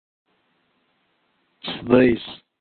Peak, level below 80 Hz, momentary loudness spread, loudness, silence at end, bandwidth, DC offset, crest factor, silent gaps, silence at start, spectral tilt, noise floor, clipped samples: -2 dBFS; -52 dBFS; 19 LU; -20 LUFS; 0.25 s; 4.5 kHz; under 0.1%; 24 dB; none; 1.65 s; -10.5 dB/octave; -68 dBFS; under 0.1%